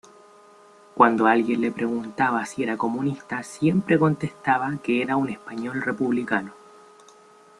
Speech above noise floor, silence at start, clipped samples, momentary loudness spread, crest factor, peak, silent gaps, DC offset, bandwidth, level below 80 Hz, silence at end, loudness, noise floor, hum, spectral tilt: 29 dB; 0.95 s; under 0.1%; 10 LU; 22 dB; -2 dBFS; none; under 0.1%; 12 kHz; -64 dBFS; 1.05 s; -23 LUFS; -52 dBFS; none; -6.5 dB/octave